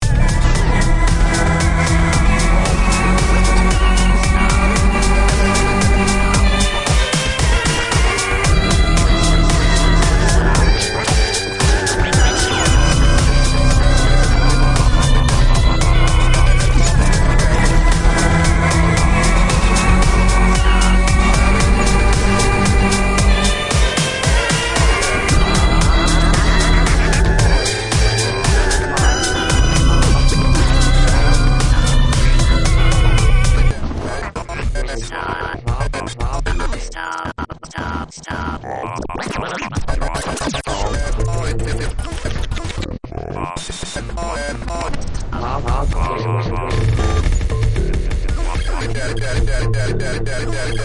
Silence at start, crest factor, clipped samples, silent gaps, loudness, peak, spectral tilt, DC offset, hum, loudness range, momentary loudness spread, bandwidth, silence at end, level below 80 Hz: 0 s; 12 dB; under 0.1%; none; -16 LUFS; 0 dBFS; -4.5 dB/octave; under 0.1%; none; 9 LU; 10 LU; 11.5 kHz; 0 s; -16 dBFS